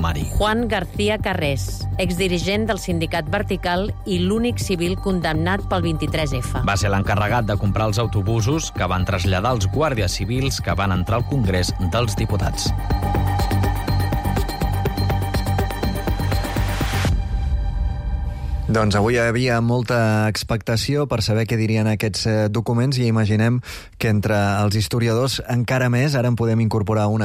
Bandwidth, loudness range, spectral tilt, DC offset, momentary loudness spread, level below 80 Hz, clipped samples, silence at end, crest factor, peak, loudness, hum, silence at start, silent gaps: 16 kHz; 3 LU; -5.5 dB/octave; under 0.1%; 5 LU; -30 dBFS; under 0.1%; 0 s; 10 dB; -8 dBFS; -21 LUFS; none; 0 s; none